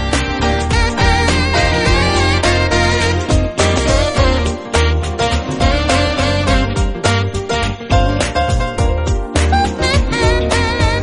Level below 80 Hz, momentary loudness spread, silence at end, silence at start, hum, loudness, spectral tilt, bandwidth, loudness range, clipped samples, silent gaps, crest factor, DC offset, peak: -20 dBFS; 4 LU; 0 s; 0 s; none; -15 LUFS; -5 dB/octave; 11 kHz; 2 LU; under 0.1%; none; 14 dB; under 0.1%; 0 dBFS